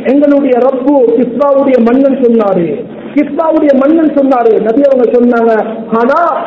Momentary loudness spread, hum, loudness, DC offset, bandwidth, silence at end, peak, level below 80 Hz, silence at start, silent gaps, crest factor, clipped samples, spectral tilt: 6 LU; none; -8 LUFS; under 0.1%; 5.8 kHz; 0 s; 0 dBFS; -50 dBFS; 0 s; none; 8 dB; 2%; -9 dB/octave